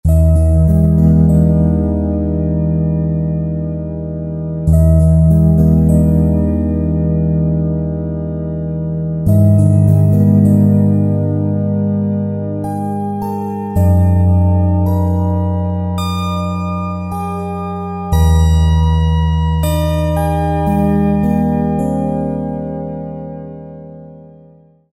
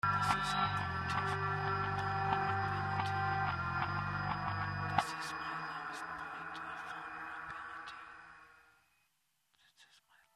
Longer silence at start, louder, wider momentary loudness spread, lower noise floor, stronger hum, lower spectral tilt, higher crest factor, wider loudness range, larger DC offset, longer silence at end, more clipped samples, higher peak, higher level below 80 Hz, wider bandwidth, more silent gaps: about the same, 0.05 s vs 0.05 s; first, -14 LUFS vs -37 LUFS; about the same, 11 LU vs 11 LU; second, -45 dBFS vs -80 dBFS; neither; first, -9 dB/octave vs -5 dB/octave; second, 12 dB vs 28 dB; second, 5 LU vs 12 LU; neither; first, 0.65 s vs 0.5 s; neither; first, 0 dBFS vs -10 dBFS; first, -22 dBFS vs -60 dBFS; about the same, 13.5 kHz vs 13.5 kHz; neither